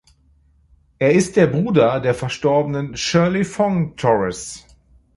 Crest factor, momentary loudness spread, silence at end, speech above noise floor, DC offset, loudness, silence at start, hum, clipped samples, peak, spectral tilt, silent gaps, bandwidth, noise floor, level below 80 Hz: 18 dB; 8 LU; 0.6 s; 38 dB; under 0.1%; -18 LUFS; 1 s; none; under 0.1%; -2 dBFS; -6 dB/octave; none; 11.5 kHz; -56 dBFS; -48 dBFS